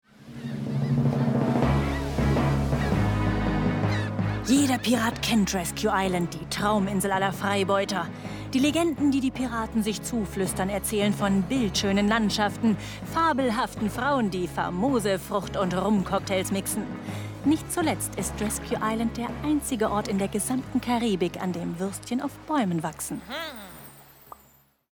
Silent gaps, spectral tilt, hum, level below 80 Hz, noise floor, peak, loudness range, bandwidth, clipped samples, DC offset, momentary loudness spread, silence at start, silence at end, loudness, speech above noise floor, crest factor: none; -5 dB/octave; none; -42 dBFS; -60 dBFS; -10 dBFS; 3 LU; 20 kHz; under 0.1%; under 0.1%; 8 LU; 0.2 s; 0.9 s; -26 LUFS; 34 dB; 16 dB